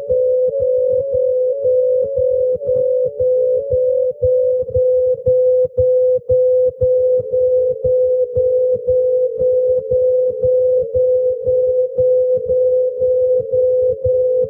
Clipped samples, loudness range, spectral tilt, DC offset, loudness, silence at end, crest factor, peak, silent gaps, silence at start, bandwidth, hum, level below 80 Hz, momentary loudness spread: under 0.1%; 1 LU; -12.5 dB/octave; under 0.1%; -15 LUFS; 0 s; 10 dB; -4 dBFS; none; 0 s; 0.8 kHz; none; -42 dBFS; 2 LU